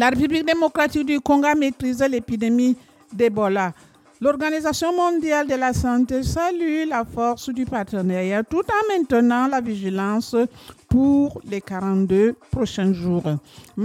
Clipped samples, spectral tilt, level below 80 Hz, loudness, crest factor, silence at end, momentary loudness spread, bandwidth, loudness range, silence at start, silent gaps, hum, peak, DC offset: under 0.1%; -6 dB/octave; -44 dBFS; -21 LUFS; 14 dB; 0 s; 7 LU; 15.5 kHz; 2 LU; 0 s; none; none; -6 dBFS; under 0.1%